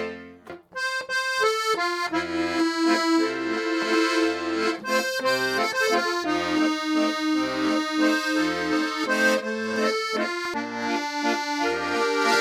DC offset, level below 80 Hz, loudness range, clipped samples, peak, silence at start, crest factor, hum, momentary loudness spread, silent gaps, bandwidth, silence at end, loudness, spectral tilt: under 0.1%; -64 dBFS; 1 LU; under 0.1%; -10 dBFS; 0 s; 16 dB; none; 6 LU; none; 15.5 kHz; 0 s; -24 LUFS; -2.5 dB/octave